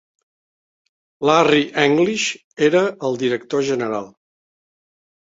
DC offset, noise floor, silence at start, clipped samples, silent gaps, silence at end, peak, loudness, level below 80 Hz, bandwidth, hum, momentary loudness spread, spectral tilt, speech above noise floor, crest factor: under 0.1%; under -90 dBFS; 1.2 s; under 0.1%; 2.44-2.57 s; 1.15 s; 0 dBFS; -18 LUFS; -62 dBFS; 8 kHz; none; 8 LU; -4.5 dB/octave; over 72 dB; 20 dB